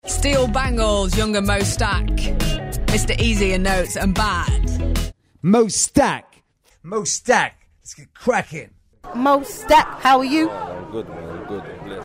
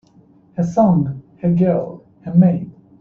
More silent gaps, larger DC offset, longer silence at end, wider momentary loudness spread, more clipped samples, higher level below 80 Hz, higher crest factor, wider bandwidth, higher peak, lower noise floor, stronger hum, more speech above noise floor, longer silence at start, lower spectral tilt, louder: neither; neither; second, 0 s vs 0.3 s; about the same, 16 LU vs 17 LU; neither; first, -26 dBFS vs -52 dBFS; about the same, 18 dB vs 16 dB; first, 16 kHz vs 6.8 kHz; about the same, -2 dBFS vs -2 dBFS; first, -57 dBFS vs -50 dBFS; neither; first, 39 dB vs 35 dB; second, 0.05 s vs 0.55 s; second, -4 dB/octave vs -11 dB/octave; about the same, -19 LUFS vs -17 LUFS